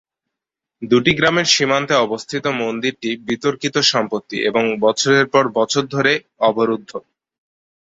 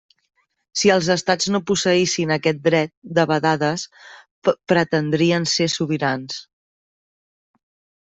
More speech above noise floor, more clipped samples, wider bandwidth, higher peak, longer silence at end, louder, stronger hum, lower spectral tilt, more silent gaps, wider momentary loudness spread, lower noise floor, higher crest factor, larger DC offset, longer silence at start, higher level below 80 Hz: second, 67 dB vs over 71 dB; neither; about the same, 8 kHz vs 8.4 kHz; about the same, -2 dBFS vs -4 dBFS; second, 0.85 s vs 1.65 s; about the same, -17 LUFS vs -19 LUFS; neither; about the same, -3.5 dB/octave vs -4.5 dB/octave; second, none vs 2.97-3.02 s, 4.31-4.42 s; about the same, 8 LU vs 7 LU; second, -84 dBFS vs under -90 dBFS; about the same, 18 dB vs 18 dB; neither; about the same, 0.8 s vs 0.75 s; about the same, -56 dBFS vs -60 dBFS